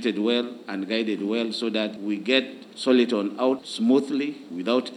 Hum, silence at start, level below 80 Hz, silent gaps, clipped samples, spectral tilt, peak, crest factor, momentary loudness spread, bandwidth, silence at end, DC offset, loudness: none; 0 s; -86 dBFS; none; under 0.1%; -5 dB/octave; -6 dBFS; 20 dB; 9 LU; 11.5 kHz; 0 s; under 0.1%; -25 LUFS